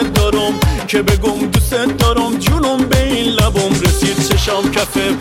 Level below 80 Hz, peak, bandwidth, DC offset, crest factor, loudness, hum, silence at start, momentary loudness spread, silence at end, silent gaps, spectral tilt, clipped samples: -22 dBFS; -2 dBFS; 17 kHz; under 0.1%; 12 dB; -14 LUFS; none; 0 s; 2 LU; 0 s; none; -5 dB/octave; under 0.1%